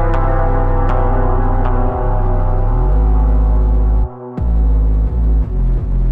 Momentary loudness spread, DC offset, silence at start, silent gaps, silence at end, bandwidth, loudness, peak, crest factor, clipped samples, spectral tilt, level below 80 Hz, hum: 4 LU; under 0.1%; 0 s; none; 0 s; 3.1 kHz; -17 LUFS; -2 dBFS; 10 dB; under 0.1%; -11 dB/octave; -14 dBFS; none